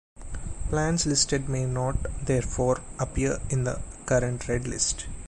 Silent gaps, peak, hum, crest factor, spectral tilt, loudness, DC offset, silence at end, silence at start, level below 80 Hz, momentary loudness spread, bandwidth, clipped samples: none; -8 dBFS; none; 18 dB; -4.5 dB/octave; -27 LUFS; under 0.1%; 0 s; 0.15 s; -36 dBFS; 9 LU; 11.5 kHz; under 0.1%